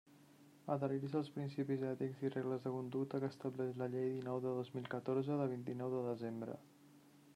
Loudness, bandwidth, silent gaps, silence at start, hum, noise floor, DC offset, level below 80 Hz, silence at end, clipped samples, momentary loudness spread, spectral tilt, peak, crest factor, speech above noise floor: -42 LUFS; 14 kHz; none; 0.1 s; none; -65 dBFS; under 0.1%; -86 dBFS; 0.05 s; under 0.1%; 5 LU; -8.5 dB/octave; -26 dBFS; 16 dB; 24 dB